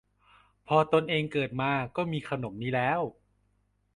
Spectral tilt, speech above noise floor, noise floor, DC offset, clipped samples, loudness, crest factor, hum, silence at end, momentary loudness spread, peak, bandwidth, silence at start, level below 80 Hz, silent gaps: -7 dB/octave; 43 dB; -71 dBFS; under 0.1%; under 0.1%; -29 LUFS; 20 dB; 50 Hz at -60 dBFS; 0.85 s; 9 LU; -10 dBFS; 11 kHz; 0.7 s; -62 dBFS; none